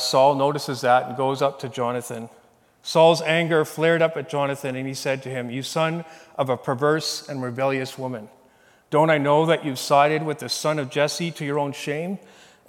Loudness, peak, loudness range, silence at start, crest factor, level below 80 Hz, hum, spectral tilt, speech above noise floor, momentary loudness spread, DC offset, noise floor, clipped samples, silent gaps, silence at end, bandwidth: -22 LUFS; -4 dBFS; 4 LU; 0 s; 20 dB; -76 dBFS; none; -4.5 dB/octave; 34 dB; 12 LU; under 0.1%; -56 dBFS; under 0.1%; none; 0.5 s; 17.5 kHz